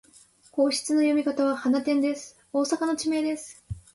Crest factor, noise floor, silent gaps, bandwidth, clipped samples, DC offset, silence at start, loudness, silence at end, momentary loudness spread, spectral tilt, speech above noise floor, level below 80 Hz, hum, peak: 14 dB; -56 dBFS; none; 11.5 kHz; under 0.1%; under 0.1%; 0.55 s; -26 LUFS; 0.15 s; 12 LU; -4 dB/octave; 32 dB; -56 dBFS; none; -12 dBFS